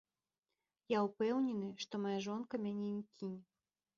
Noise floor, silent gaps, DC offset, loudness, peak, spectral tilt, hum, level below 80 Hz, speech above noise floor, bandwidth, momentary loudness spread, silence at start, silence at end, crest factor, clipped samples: under -90 dBFS; none; under 0.1%; -40 LUFS; -22 dBFS; -5.5 dB/octave; none; -84 dBFS; over 51 dB; 7.4 kHz; 11 LU; 0.9 s; 0.55 s; 18 dB; under 0.1%